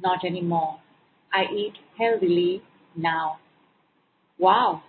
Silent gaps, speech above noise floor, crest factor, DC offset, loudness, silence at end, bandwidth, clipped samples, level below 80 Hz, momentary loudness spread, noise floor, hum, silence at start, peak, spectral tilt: none; 43 dB; 18 dB; under 0.1%; -24 LUFS; 0.1 s; 4.5 kHz; under 0.1%; -72 dBFS; 14 LU; -67 dBFS; none; 0 s; -8 dBFS; -10 dB/octave